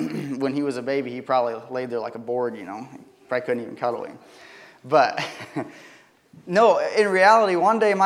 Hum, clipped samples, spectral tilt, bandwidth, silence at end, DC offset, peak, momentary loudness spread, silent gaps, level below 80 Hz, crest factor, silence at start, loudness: none; under 0.1%; -5 dB/octave; 13 kHz; 0 s; under 0.1%; -2 dBFS; 16 LU; none; -78 dBFS; 20 dB; 0 s; -22 LUFS